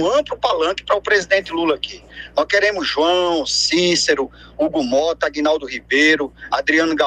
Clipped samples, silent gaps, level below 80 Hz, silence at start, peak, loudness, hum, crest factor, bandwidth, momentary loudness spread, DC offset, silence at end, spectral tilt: under 0.1%; none; -48 dBFS; 0 s; 0 dBFS; -17 LUFS; none; 18 dB; 10.5 kHz; 8 LU; under 0.1%; 0 s; -2.5 dB/octave